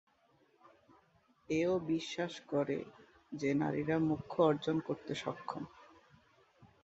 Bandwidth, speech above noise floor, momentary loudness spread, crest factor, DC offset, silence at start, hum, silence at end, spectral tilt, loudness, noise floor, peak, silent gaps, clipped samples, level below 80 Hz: 8 kHz; 36 dB; 13 LU; 22 dB; under 0.1%; 1.5 s; none; 0.2 s; -5.5 dB/octave; -36 LUFS; -71 dBFS; -16 dBFS; none; under 0.1%; -70 dBFS